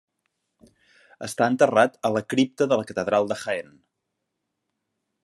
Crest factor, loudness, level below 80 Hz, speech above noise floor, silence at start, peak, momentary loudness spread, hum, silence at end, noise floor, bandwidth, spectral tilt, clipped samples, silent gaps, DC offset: 22 dB; -23 LUFS; -72 dBFS; 58 dB; 1.2 s; -4 dBFS; 12 LU; none; 1.6 s; -80 dBFS; 12.5 kHz; -5 dB/octave; under 0.1%; none; under 0.1%